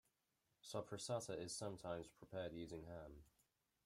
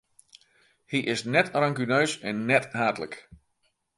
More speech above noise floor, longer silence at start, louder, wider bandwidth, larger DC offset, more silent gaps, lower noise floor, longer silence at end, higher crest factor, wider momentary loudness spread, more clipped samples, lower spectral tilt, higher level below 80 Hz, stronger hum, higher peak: second, 37 dB vs 47 dB; second, 0.65 s vs 0.9 s; second, -50 LUFS vs -26 LUFS; first, 16 kHz vs 11.5 kHz; neither; neither; first, -87 dBFS vs -73 dBFS; about the same, 0.55 s vs 0.6 s; about the same, 20 dB vs 24 dB; about the same, 11 LU vs 10 LU; neither; about the same, -4.5 dB/octave vs -5 dB/octave; second, -74 dBFS vs -66 dBFS; neither; second, -32 dBFS vs -4 dBFS